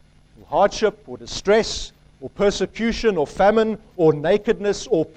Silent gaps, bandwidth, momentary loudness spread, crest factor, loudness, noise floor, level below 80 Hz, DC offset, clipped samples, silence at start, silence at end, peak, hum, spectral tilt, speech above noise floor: none; 9.4 kHz; 13 LU; 16 dB; -20 LUFS; -49 dBFS; -42 dBFS; under 0.1%; under 0.1%; 0.5 s; 0.1 s; -4 dBFS; none; -5 dB/octave; 30 dB